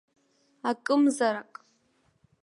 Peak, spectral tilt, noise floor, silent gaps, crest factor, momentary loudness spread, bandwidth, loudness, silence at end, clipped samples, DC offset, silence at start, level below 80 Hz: -14 dBFS; -3.5 dB/octave; -69 dBFS; none; 16 dB; 13 LU; 11.5 kHz; -27 LUFS; 1 s; under 0.1%; under 0.1%; 0.65 s; -82 dBFS